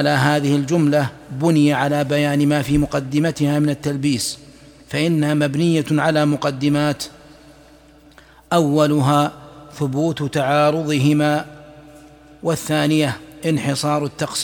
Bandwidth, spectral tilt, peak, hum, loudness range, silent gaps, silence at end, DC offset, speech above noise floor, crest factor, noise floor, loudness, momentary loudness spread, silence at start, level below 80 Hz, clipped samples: 18.5 kHz; -6 dB/octave; -2 dBFS; none; 3 LU; none; 0 s; under 0.1%; 30 dB; 16 dB; -47 dBFS; -18 LUFS; 8 LU; 0 s; -46 dBFS; under 0.1%